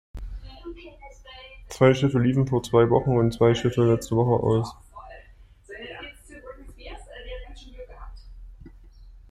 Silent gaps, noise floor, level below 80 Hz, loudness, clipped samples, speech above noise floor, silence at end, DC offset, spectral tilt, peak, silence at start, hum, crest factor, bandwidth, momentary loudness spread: none; -51 dBFS; -44 dBFS; -22 LUFS; under 0.1%; 29 dB; 0.2 s; under 0.1%; -7.5 dB/octave; -4 dBFS; 0.15 s; none; 20 dB; 14 kHz; 24 LU